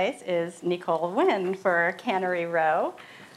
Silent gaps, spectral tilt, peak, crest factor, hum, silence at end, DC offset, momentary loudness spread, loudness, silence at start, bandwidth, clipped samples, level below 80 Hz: none; -5.5 dB/octave; -10 dBFS; 16 dB; none; 0.1 s; under 0.1%; 6 LU; -26 LUFS; 0 s; 13 kHz; under 0.1%; -80 dBFS